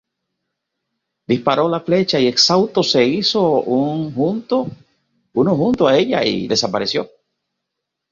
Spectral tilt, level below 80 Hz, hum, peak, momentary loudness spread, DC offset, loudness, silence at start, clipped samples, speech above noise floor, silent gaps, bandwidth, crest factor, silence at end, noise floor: -4.5 dB/octave; -56 dBFS; none; -2 dBFS; 8 LU; under 0.1%; -16 LUFS; 1.3 s; under 0.1%; 63 dB; none; 7.6 kHz; 16 dB; 1.05 s; -79 dBFS